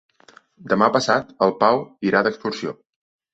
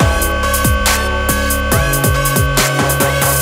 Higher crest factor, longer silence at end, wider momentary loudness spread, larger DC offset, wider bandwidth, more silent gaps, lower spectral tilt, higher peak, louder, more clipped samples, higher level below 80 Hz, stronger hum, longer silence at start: first, 20 dB vs 14 dB; first, 0.6 s vs 0 s; first, 10 LU vs 2 LU; neither; second, 8.2 kHz vs 16.5 kHz; neither; first, -5 dB/octave vs -3.5 dB/octave; about the same, -2 dBFS vs 0 dBFS; second, -20 LUFS vs -13 LUFS; neither; second, -62 dBFS vs -20 dBFS; neither; first, 0.65 s vs 0 s